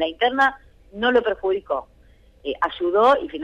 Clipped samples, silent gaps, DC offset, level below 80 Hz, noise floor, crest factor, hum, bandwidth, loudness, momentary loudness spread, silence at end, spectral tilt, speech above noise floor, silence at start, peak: under 0.1%; none; under 0.1%; -52 dBFS; -52 dBFS; 14 dB; none; 9 kHz; -21 LUFS; 11 LU; 0 s; -4.5 dB/octave; 32 dB; 0 s; -8 dBFS